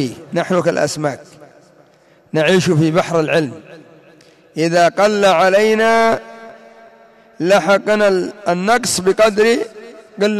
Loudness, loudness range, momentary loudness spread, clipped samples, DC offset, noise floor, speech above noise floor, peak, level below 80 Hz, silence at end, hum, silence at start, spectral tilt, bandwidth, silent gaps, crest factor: -15 LUFS; 3 LU; 11 LU; under 0.1%; under 0.1%; -50 dBFS; 36 dB; -2 dBFS; -56 dBFS; 0 s; none; 0 s; -4.5 dB/octave; 14.5 kHz; none; 14 dB